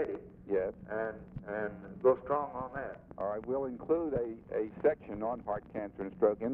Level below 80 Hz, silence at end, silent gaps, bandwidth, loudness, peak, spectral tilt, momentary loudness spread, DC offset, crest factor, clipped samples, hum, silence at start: -60 dBFS; 0 s; none; 3.9 kHz; -35 LUFS; -14 dBFS; -8 dB/octave; 10 LU; under 0.1%; 20 dB; under 0.1%; none; 0 s